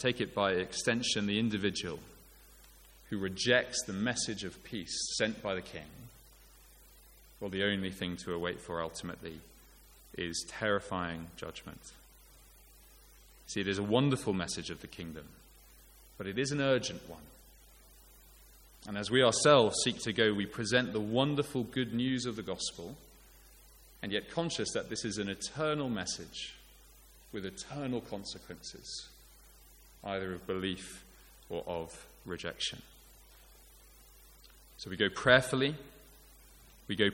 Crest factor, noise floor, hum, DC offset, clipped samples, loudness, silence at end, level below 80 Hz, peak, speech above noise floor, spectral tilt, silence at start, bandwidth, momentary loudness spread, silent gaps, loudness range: 28 dB; -58 dBFS; none; under 0.1%; under 0.1%; -33 LUFS; 0 s; -60 dBFS; -8 dBFS; 25 dB; -4 dB/octave; 0 s; 17 kHz; 18 LU; none; 11 LU